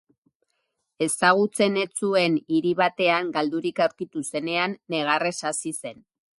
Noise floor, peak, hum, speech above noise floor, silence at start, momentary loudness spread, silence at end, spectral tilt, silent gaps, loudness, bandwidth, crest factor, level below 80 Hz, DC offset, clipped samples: -76 dBFS; -4 dBFS; none; 52 dB; 1 s; 9 LU; 0.45 s; -3.5 dB/octave; none; -24 LUFS; 12 kHz; 20 dB; -72 dBFS; under 0.1%; under 0.1%